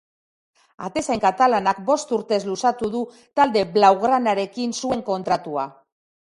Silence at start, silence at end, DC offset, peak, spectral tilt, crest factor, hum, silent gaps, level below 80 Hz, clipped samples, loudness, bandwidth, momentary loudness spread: 0.8 s; 0.65 s; under 0.1%; -2 dBFS; -4.5 dB/octave; 20 dB; none; none; -58 dBFS; under 0.1%; -21 LUFS; 11.5 kHz; 12 LU